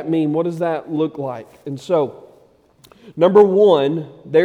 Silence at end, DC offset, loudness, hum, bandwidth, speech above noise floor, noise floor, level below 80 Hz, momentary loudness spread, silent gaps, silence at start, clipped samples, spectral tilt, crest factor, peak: 0 s; under 0.1%; -17 LUFS; none; 8.6 kHz; 36 dB; -52 dBFS; -66 dBFS; 18 LU; none; 0 s; under 0.1%; -7.5 dB/octave; 16 dB; 0 dBFS